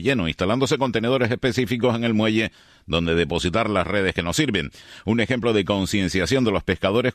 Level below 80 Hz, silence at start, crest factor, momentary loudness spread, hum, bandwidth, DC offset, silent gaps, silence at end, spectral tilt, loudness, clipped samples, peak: -44 dBFS; 0 s; 16 dB; 4 LU; none; 13.5 kHz; under 0.1%; none; 0 s; -5 dB/octave; -22 LUFS; under 0.1%; -6 dBFS